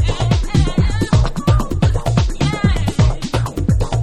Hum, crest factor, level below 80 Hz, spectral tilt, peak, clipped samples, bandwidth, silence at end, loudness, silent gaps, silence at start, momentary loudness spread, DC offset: none; 14 dB; -20 dBFS; -6.5 dB/octave; -2 dBFS; under 0.1%; 13 kHz; 0 s; -17 LUFS; none; 0 s; 2 LU; under 0.1%